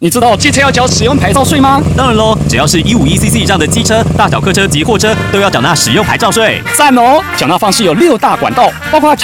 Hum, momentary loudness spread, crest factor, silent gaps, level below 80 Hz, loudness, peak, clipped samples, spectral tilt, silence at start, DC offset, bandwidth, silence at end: none; 3 LU; 8 dB; none; -26 dBFS; -8 LUFS; 0 dBFS; 0.9%; -4 dB/octave; 0 s; under 0.1%; 18 kHz; 0 s